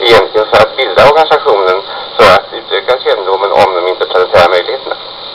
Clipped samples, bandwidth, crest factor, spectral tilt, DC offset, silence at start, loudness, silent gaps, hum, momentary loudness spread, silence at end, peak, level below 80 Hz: 1%; over 20 kHz; 8 dB; -4 dB/octave; under 0.1%; 0 s; -9 LUFS; none; none; 10 LU; 0 s; 0 dBFS; -40 dBFS